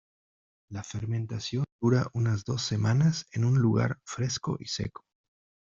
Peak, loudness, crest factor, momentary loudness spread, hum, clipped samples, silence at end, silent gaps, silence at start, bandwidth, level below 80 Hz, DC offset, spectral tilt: -12 dBFS; -29 LUFS; 16 dB; 11 LU; none; under 0.1%; 0.85 s; 1.72-1.79 s; 0.7 s; 7.6 kHz; -60 dBFS; under 0.1%; -6 dB/octave